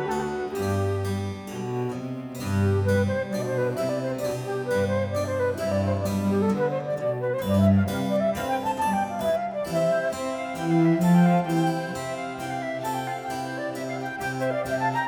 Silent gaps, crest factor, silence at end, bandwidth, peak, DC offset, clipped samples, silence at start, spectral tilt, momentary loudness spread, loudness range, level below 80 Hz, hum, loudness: none; 16 dB; 0 s; 19.5 kHz; -8 dBFS; under 0.1%; under 0.1%; 0 s; -7 dB/octave; 10 LU; 3 LU; -58 dBFS; none; -26 LUFS